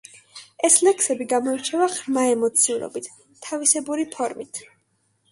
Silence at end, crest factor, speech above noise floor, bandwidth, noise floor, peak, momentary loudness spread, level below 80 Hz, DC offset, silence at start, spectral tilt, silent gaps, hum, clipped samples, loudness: 0.7 s; 22 dB; 46 dB; 12 kHz; -68 dBFS; -2 dBFS; 19 LU; -72 dBFS; under 0.1%; 0.15 s; -1.5 dB/octave; none; none; under 0.1%; -20 LUFS